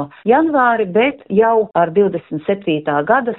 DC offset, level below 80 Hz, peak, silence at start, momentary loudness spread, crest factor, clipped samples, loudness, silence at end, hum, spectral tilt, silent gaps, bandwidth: under 0.1%; -56 dBFS; -2 dBFS; 0 s; 5 LU; 14 dB; under 0.1%; -15 LUFS; 0 s; none; -4.5 dB/octave; none; 4.1 kHz